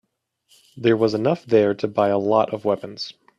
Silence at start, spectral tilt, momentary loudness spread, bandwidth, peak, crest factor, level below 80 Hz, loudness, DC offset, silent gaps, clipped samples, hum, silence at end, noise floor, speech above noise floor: 0.75 s; -7 dB/octave; 7 LU; 11 kHz; -4 dBFS; 18 dB; -64 dBFS; -20 LUFS; under 0.1%; none; under 0.1%; none; 0.25 s; -67 dBFS; 47 dB